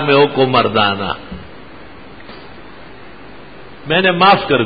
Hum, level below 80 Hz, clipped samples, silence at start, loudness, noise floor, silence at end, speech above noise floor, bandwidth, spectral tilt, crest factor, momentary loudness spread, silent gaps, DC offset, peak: none; -46 dBFS; under 0.1%; 0 s; -13 LUFS; -37 dBFS; 0 s; 24 dB; 5 kHz; -8.5 dB/octave; 16 dB; 26 LU; none; 1%; 0 dBFS